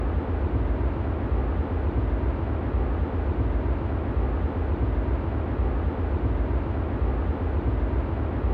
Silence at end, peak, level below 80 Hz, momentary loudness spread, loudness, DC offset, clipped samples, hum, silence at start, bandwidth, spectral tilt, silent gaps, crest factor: 0 s; -14 dBFS; -26 dBFS; 1 LU; -27 LUFS; under 0.1%; under 0.1%; none; 0 s; 4.3 kHz; -11 dB/octave; none; 10 dB